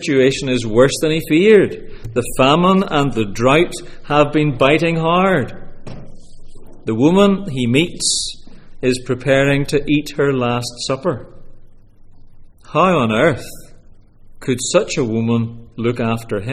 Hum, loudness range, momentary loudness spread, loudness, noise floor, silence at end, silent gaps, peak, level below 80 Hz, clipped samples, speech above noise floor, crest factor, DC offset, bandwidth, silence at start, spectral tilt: none; 5 LU; 12 LU; -16 LUFS; -41 dBFS; 0 s; none; 0 dBFS; -36 dBFS; under 0.1%; 26 dB; 16 dB; under 0.1%; 16 kHz; 0 s; -5 dB/octave